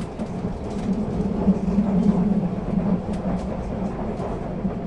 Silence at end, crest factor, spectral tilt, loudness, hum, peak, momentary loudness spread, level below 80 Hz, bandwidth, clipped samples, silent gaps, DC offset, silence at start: 0 s; 16 dB; -9 dB/octave; -24 LUFS; none; -8 dBFS; 9 LU; -36 dBFS; 8.8 kHz; under 0.1%; none; under 0.1%; 0 s